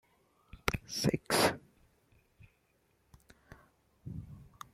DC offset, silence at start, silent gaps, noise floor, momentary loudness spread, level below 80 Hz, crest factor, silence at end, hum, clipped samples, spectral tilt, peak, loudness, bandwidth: under 0.1%; 0.55 s; none; -74 dBFS; 23 LU; -58 dBFS; 32 dB; 0.3 s; none; under 0.1%; -4 dB/octave; -8 dBFS; -33 LUFS; 16.5 kHz